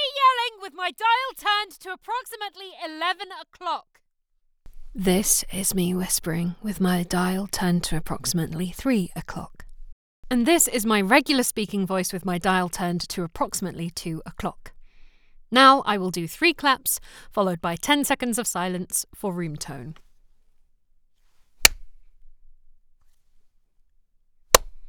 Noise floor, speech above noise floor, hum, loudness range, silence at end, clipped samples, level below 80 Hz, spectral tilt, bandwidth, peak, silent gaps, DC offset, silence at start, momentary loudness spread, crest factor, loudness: -68 dBFS; 44 dB; none; 7 LU; 0 s; under 0.1%; -46 dBFS; -3 dB/octave; over 20 kHz; 0 dBFS; 9.92-10.23 s; under 0.1%; 0 s; 15 LU; 26 dB; -23 LUFS